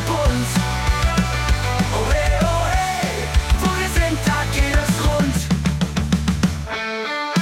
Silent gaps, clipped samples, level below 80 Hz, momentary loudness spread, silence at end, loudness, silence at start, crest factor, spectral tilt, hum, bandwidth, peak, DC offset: none; under 0.1%; -24 dBFS; 3 LU; 0 s; -20 LUFS; 0 s; 14 dB; -5 dB/octave; none; 16.5 kHz; -6 dBFS; under 0.1%